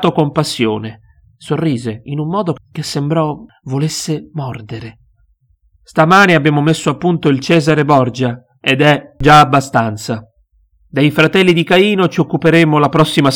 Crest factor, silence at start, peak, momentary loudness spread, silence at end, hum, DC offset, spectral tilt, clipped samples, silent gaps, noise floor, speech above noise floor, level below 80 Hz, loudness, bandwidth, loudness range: 14 dB; 0 s; 0 dBFS; 14 LU; 0 s; none; under 0.1%; -5.5 dB/octave; under 0.1%; none; -55 dBFS; 43 dB; -42 dBFS; -13 LUFS; 17 kHz; 8 LU